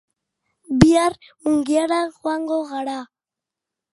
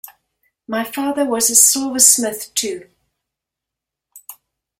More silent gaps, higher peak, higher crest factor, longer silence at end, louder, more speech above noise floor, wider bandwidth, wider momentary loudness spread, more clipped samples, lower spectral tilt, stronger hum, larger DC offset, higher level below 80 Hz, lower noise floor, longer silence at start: neither; about the same, 0 dBFS vs 0 dBFS; about the same, 22 dB vs 20 dB; first, 0.9 s vs 0.45 s; second, -20 LUFS vs -14 LUFS; about the same, 66 dB vs 68 dB; second, 11.5 kHz vs 16.5 kHz; about the same, 13 LU vs 15 LU; neither; first, -6 dB/octave vs -0.5 dB/octave; neither; neither; first, -44 dBFS vs -64 dBFS; about the same, -87 dBFS vs -84 dBFS; about the same, 0.7 s vs 0.7 s